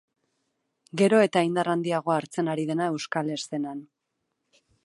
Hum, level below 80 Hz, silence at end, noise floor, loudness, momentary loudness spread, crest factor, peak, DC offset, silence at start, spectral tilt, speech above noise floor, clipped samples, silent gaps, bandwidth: none; -78 dBFS; 1 s; -80 dBFS; -26 LUFS; 12 LU; 20 dB; -8 dBFS; under 0.1%; 0.95 s; -5.5 dB/octave; 55 dB; under 0.1%; none; 11.5 kHz